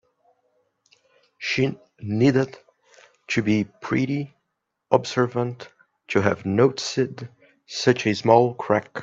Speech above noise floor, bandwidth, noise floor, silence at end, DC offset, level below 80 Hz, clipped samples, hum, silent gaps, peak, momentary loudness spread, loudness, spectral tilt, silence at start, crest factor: 57 dB; 7.8 kHz; -78 dBFS; 0 s; under 0.1%; -62 dBFS; under 0.1%; none; none; 0 dBFS; 13 LU; -23 LUFS; -6 dB/octave; 1.4 s; 22 dB